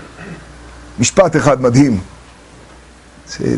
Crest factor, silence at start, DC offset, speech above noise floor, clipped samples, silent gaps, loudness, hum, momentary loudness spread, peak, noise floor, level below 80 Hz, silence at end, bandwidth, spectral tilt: 16 dB; 0 s; under 0.1%; 29 dB; under 0.1%; none; -13 LUFS; none; 22 LU; 0 dBFS; -41 dBFS; -40 dBFS; 0 s; 11.5 kHz; -5.5 dB/octave